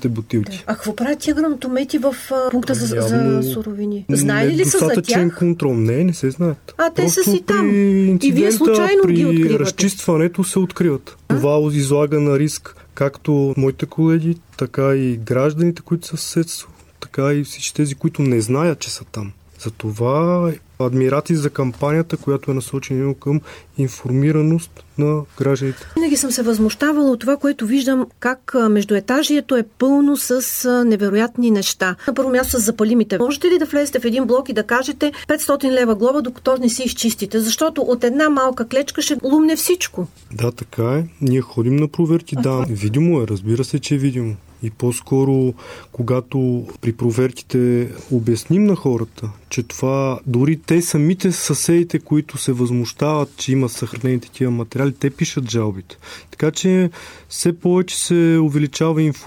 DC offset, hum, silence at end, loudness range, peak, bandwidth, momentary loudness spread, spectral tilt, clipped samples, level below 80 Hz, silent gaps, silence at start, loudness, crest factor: under 0.1%; none; 0 s; 4 LU; -4 dBFS; 18.5 kHz; 8 LU; -5.5 dB/octave; under 0.1%; -50 dBFS; none; 0 s; -18 LUFS; 14 dB